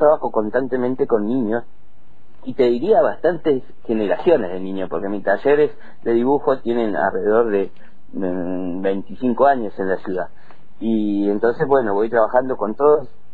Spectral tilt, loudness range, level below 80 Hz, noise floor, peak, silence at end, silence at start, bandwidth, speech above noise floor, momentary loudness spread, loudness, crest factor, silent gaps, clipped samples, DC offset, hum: -9 dB/octave; 2 LU; -52 dBFS; -52 dBFS; -2 dBFS; 0.3 s; 0 s; 4.6 kHz; 33 dB; 10 LU; -19 LUFS; 16 dB; none; under 0.1%; 4%; none